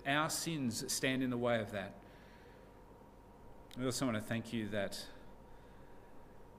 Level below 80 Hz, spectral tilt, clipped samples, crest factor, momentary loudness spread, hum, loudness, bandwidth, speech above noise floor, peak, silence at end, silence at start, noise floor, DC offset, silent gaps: -62 dBFS; -4 dB/octave; under 0.1%; 22 dB; 24 LU; 50 Hz at -70 dBFS; -38 LUFS; 15.5 kHz; 21 dB; -18 dBFS; 0 s; 0 s; -58 dBFS; under 0.1%; none